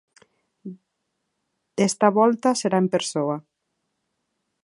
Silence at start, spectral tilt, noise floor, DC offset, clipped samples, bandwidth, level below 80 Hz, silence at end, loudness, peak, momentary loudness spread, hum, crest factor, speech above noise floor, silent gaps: 0.65 s; -5 dB/octave; -77 dBFS; under 0.1%; under 0.1%; 11.5 kHz; -72 dBFS; 1.25 s; -21 LUFS; -2 dBFS; 23 LU; none; 22 dB; 57 dB; none